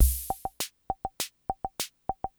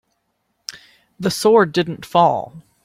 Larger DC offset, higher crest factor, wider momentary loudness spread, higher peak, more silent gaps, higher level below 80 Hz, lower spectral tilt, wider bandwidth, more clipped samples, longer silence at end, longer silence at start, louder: neither; about the same, 22 dB vs 18 dB; second, 4 LU vs 20 LU; second, -8 dBFS vs -2 dBFS; neither; first, -34 dBFS vs -60 dBFS; second, -3 dB/octave vs -5 dB/octave; first, over 20 kHz vs 16 kHz; neither; second, 0.1 s vs 0.25 s; second, 0 s vs 0.7 s; second, -34 LUFS vs -17 LUFS